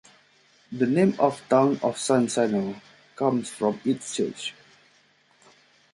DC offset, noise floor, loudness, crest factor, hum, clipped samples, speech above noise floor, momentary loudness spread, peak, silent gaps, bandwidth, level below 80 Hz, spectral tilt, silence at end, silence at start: under 0.1%; -61 dBFS; -25 LUFS; 20 dB; none; under 0.1%; 38 dB; 13 LU; -6 dBFS; none; 11.5 kHz; -70 dBFS; -5.5 dB/octave; 1.4 s; 0.7 s